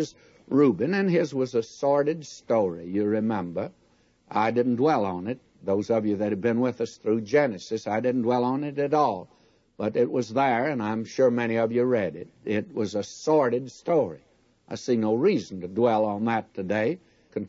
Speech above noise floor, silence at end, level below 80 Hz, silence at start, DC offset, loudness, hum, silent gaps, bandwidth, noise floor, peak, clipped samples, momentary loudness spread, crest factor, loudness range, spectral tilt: 37 dB; 0 s; -68 dBFS; 0 s; under 0.1%; -26 LUFS; none; none; 7.8 kHz; -62 dBFS; -10 dBFS; under 0.1%; 10 LU; 16 dB; 2 LU; -6.5 dB/octave